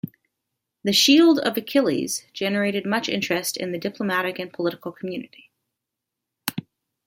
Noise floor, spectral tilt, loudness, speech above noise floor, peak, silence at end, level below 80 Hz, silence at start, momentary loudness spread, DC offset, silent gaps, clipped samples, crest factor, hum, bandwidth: -84 dBFS; -3.5 dB/octave; -22 LUFS; 62 dB; -4 dBFS; 0.45 s; -70 dBFS; 0.05 s; 17 LU; under 0.1%; none; under 0.1%; 20 dB; none; 16.5 kHz